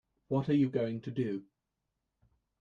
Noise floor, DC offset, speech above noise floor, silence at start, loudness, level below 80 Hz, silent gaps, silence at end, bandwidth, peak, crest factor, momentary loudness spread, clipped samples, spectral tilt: -86 dBFS; under 0.1%; 54 dB; 0.3 s; -33 LUFS; -70 dBFS; none; 1.2 s; 7 kHz; -18 dBFS; 16 dB; 8 LU; under 0.1%; -9.5 dB/octave